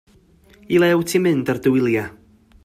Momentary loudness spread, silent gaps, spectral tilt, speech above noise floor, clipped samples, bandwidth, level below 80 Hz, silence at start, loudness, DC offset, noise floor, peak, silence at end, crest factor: 6 LU; none; -6 dB/octave; 34 dB; under 0.1%; 15.5 kHz; -54 dBFS; 0.7 s; -18 LUFS; under 0.1%; -52 dBFS; -4 dBFS; 0.55 s; 16 dB